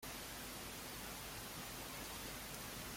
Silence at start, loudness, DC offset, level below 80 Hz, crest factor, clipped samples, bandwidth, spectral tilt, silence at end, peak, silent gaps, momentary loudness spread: 0 s; -47 LUFS; under 0.1%; -62 dBFS; 20 dB; under 0.1%; 16.5 kHz; -2.5 dB/octave; 0 s; -30 dBFS; none; 1 LU